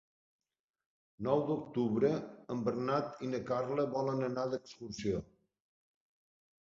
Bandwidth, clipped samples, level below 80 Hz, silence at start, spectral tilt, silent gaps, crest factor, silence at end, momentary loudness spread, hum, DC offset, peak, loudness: 7.6 kHz; under 0.1%; -66 dBFS; 1.2 s; -6.5 dB/octave; none; 20 dB; 1.4 s; 8 LU; none; under 0.1%; -16 dBFS; -35 LUFS